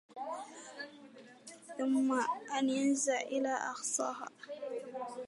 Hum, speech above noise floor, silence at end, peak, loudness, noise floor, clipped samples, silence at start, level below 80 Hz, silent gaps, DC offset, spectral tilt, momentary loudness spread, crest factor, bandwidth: none; 22 dB; 0 s; -20 dBFS; -35 LUFS; -56 dBFS; under 0.1%; 0.1 s; under -90 dBFS; none; under 0.1%; -2 dB/octave; 18 LU; 16 dB; 11.5 kHz